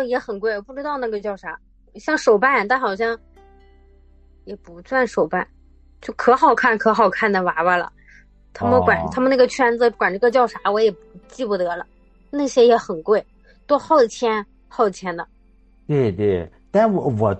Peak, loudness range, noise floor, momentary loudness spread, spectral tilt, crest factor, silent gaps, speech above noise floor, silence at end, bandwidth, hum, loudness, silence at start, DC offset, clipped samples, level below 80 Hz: -2 dBFS; 4 LU; -52 dBFS; 16 LU; -5.5 dB/octave; 18 dB; none; 34 dB; 0 s; 8.6 kHz; none; -19 LUFS; 0 s; under 0.1%; under 0.1%; -50 dBFS